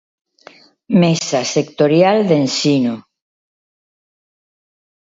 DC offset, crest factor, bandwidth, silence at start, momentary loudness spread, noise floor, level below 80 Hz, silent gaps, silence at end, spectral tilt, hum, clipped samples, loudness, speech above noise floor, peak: under 0.1%; 18 dB; 7.8 kHz; 0.9 s; 6 LU; -45 dBFS; -64 dBFS; none; 2.05 s; -5.5 dB/octave; none; under 0.1%; -15 LUFS; 31 dB; 0 dBFS